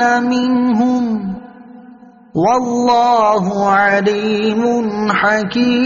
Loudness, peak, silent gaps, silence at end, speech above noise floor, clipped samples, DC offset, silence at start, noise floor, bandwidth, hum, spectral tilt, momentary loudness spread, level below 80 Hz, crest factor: -14 LUFS; -2 dBFS; none; 0 s; 27 dB; under 0.1%; under 0.1%; 0 s; -40 dBFS; 7.2 kHz; none; -4 dB/octave; 6 LU; -52 dBFS; 12 dB